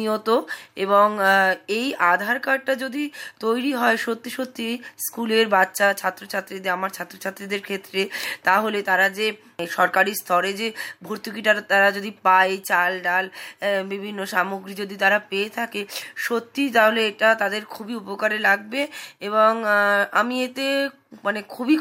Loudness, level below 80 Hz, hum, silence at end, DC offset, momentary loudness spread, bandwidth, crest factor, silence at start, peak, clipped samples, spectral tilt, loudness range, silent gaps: -21 LUFS; -76 dBFS; none; 0 s; under 0.1%; 12 LU; 16.5 kHz; 18 dB; 0 s; -4 dBFS; under 0.1%; -3.5 dB/octave; 3 LU; none